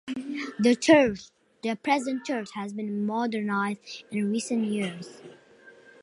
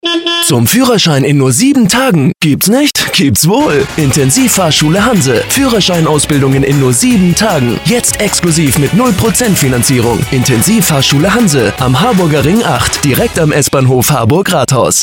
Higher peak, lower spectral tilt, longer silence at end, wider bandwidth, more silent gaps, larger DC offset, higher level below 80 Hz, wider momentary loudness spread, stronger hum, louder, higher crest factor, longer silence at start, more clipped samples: second, -6 dBFS vs 0 dBFS; about the same, -5 dB/octave vs -4 dB/octave; first, 0.3 s vs 0 s; second, 11.5 kHz vs 19 kHz; neither; neither; second, -64 dBFS vs -32 dBFS; first, 15 LU vs 3 LU; neither; second, -27 LUFS vs -8 LUFS; first, 22 dB vs 8 dB; about the same, 0.05 s vs 0.05 s; neither